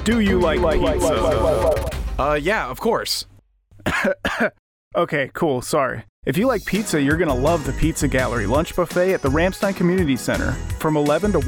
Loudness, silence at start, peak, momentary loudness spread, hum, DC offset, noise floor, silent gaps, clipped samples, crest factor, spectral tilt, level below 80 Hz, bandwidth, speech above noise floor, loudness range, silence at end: -20 LUFS; 0 s; -6 dBFS; 6 LU; none; under 0.1%; -51 dBFS; 4.59-4.91 s, 6.09-6.23 s; under 0.1%; 14 dB; -5.5 dB/octave; -32 dBFS; over 20 kHz; 31 dB; 3 LU; 0 s